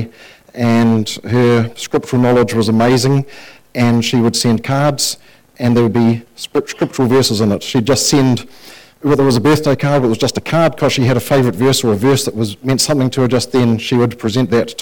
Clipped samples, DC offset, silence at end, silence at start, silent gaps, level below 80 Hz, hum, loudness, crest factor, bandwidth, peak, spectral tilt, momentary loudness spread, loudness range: under 0.1%; under 0.1%; 0 s; 0 s; none; -44 dBFS; none; -14 LUFS; 10 dB; 19 kHz; -4 dBFS; -5.5 dB/octave; 8 LU; 1 LU